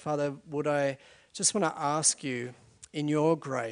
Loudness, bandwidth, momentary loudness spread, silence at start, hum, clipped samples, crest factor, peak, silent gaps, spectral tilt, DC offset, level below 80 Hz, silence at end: -29 LUFS; 11 kHz; 14 LU; 0 s; none; under 0.1%; 20 dB; -10 dBFS; none; -3.5 dB/octave; under 0.1%; -74 dBFS; 0 s